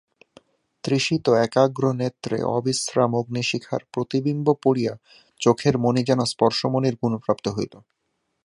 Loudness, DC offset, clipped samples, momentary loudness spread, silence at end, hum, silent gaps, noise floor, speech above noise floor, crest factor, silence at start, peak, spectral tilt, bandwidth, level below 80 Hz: -22 LUFS; under 0.1%; under 0.1%; 8 LU; 0.65 s; none; none; -55 dBFS; 33 dB; 20 dB; 0.85 s; -2 dBFS; -5.5 dB/octave; 11.5 kHz; -60 dBFS